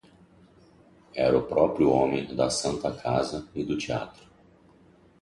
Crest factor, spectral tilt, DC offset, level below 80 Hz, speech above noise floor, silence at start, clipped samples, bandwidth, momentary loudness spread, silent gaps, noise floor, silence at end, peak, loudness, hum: 20 dB; -5 dB/octave; under 0.1%; -54 dBFS; 32 dB; 1.15 s; under 0.1%; 11.5 kHz; 11 LU; none; -57 dBFS; 1.1 s; -8 dBFS; -26 LUFS; none